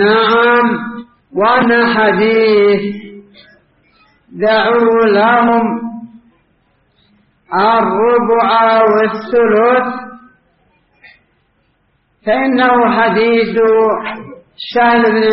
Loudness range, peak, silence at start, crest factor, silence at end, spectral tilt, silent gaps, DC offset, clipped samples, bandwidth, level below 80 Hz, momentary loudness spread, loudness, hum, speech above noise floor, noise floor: 4 LU; 0 dBFS; 0 s; 12 dB; 0 s; -3 dB/octave; none; under 0.1%; under 0.1%; 5.8 kHz; -54 dBFS; 14 LU; -11 LUFS; none; 48 dB; -59 dBFS